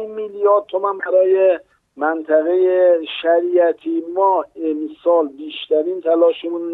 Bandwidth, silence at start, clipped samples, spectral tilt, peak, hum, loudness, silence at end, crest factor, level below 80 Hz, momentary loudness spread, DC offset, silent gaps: 4.1 kHz; 0 s; under 0.1%; -6.5 dB/octave; -4 dBFS; none; -17 LUFS; 0 s; 14 dB; -70 dBFS; 9 LU; under 0.1%; none